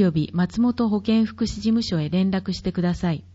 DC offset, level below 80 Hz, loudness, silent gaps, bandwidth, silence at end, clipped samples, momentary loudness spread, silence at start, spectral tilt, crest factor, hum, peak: under 0.1%; -44 dBFS; -23 LUFS; none; 8 kHz; 0.1 s; under 0.1%; 4 LU; 0 s; -7 dB/octave; 14 dB; none; -8 dBFS